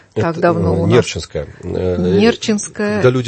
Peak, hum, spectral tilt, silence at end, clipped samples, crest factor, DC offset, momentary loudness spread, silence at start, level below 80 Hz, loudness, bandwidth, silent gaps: 0 dBFS; none; -6 dB/octave; 0 s; under 0.1%; 16 dB; under 0.1%; 11 LU; 0.15 s; -42 dBFS; -16 LUFS; 8.8 kHz; none